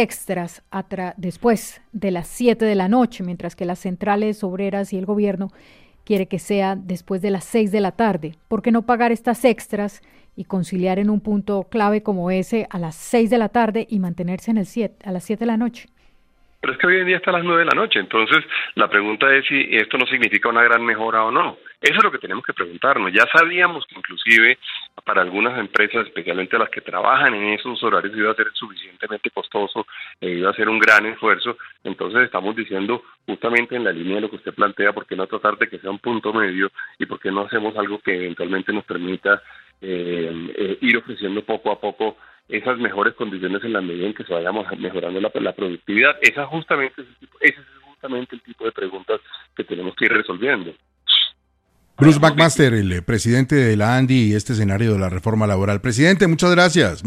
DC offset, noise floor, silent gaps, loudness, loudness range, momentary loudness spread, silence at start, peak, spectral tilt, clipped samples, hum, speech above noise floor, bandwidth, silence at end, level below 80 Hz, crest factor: under 0.1%; -63 dBFS; none; -19 LUFS; 7 LU; 13 LU; 0 s; 0 dBFS; -5 dB/octave; under 0.1%; none; 44 dB; 15 kHz; 0 s; -52 dBFS; 20 dB